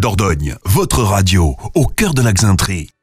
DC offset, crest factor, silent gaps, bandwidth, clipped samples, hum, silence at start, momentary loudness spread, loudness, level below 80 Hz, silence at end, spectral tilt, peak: under 0.1%; 12 dB; none; 16 kHz; under 0.1%; none; 0 s; 5 LU; -14 LUFS; -24 dBFS; 0.15 s; -5 dB/octave; -2 dBFS